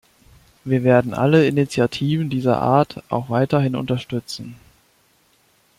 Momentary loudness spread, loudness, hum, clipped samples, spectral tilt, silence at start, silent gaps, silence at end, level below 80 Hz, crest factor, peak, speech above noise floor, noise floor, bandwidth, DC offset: 12 LU; -19 LUFS; none; under 0.1%; -7 dB/octave; 0.65 s; none; 1.25 s; -54 dBFS; 18 dB; -2 dBFS; 41 dB; -59 dBFS; 15 kHz; under 0.1%